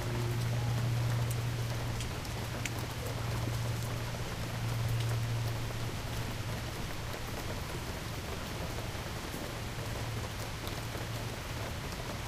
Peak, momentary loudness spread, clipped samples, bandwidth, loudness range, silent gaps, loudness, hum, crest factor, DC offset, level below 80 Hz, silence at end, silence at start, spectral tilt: -16 dBFS; 6 LU; under 0.1%; 15.5 kHz; 4 LU; none; -37 LUFS; none; 18 dB; under 0.1%; -46 dBFS; 0 s; 0 s; -5 dB/octave